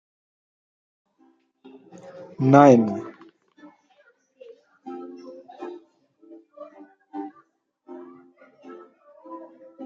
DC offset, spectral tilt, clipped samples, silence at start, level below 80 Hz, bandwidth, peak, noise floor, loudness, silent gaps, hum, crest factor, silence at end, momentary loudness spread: under 0.1%; -8 dB/octave; under 0.1%; 2.4 s; -74 dBFS; 7.2 kHz; -2 dBFS; -62 dBFS; -17 LUFS; none; none; 24 dB; 0 s; 31 LU